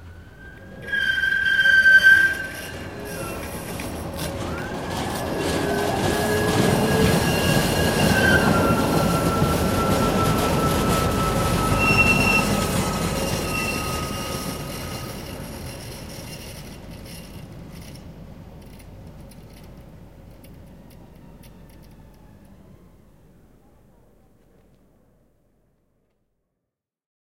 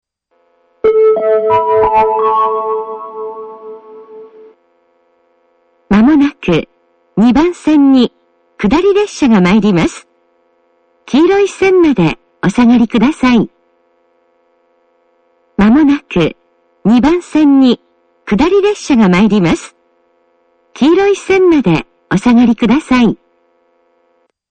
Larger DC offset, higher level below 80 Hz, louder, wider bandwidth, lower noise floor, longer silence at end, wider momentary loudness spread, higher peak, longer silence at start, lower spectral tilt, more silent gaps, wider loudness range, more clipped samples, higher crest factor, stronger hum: first, 0.1% vs under 0.1%; about the same, -38 dBFS vs -38 dBFS; second, -20 LUFS vs -11 LUFS; first, 16.5 kHz vs 9.2 kHz; first, -83 dBFS vs -58 dBFS; first, 5.15 s vs 1.35 s; first, 23 LU vs 11 LU; second, -4 dBFS vs 0 dBFS; second, 0 s vs 0.85 s; second, -4.5 dB/octave vs -6.5 dB/octave; neither; first, 21 LU vs 5 LU; neither; first, 20 dB vs 12 dB; neither